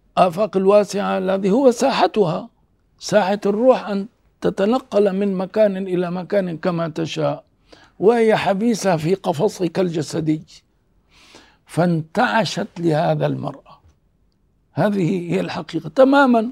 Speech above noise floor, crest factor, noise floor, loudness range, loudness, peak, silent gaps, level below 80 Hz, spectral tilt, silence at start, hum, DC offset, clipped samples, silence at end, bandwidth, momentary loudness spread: 44 dB; 18 dB; -62 dBFS; 4 LU; -19 LUFS; 0 dBFS; none; -60 dBFS; -6 dB/octave; 0.15 s; none; under 0.1%; under 0.1%; 0 s; 15 kHz; 9 LU